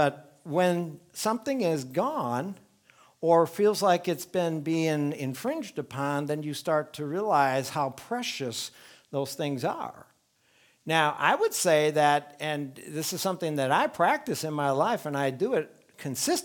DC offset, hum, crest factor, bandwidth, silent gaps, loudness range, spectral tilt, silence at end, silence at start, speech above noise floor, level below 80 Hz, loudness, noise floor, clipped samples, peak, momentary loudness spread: under 0.1%; none; 22 dB; 19.5 kHz; none; 4 LU; -4.5 dB/octave; 0 s; 0 s; 39 dB; -76 dBFS; -28 LUFS; -66 dBFS; under 0.1%; -6 dBFS; 11 LU